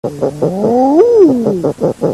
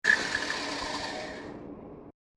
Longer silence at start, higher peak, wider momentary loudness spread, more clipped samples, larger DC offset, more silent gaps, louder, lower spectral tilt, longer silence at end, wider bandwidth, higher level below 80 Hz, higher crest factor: about the same, 0.05 s vs 0.05 s; first, 0 dBFS vs -10 dBFS; second, 8 LU vs 20 LU; first, 0.2% vs under 0.1%; first, 0.2% vs under 0.1%; neither; first, -11 LUFS vs -31 LUFS; first, -8.5 dB/octave vs -2 dB/octave; second, 0 s vs 0.25 s; about the same, 13 kHz vs 13 kHz; first, -48 dBFS vs -58 dBFS; second, 10 dB vs 22 dB